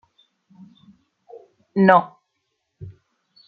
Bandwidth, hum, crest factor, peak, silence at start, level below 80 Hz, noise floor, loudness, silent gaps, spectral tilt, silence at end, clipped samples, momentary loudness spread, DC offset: 4.8 kHz; none; 22 dB; -2 dBFS; 1.75 s; -66 dBFS; -75 dBFS; -17 LUFS; none; -9.5 dB/octave; 0.55 s; under 0.1%; 28 LU; under 0.1%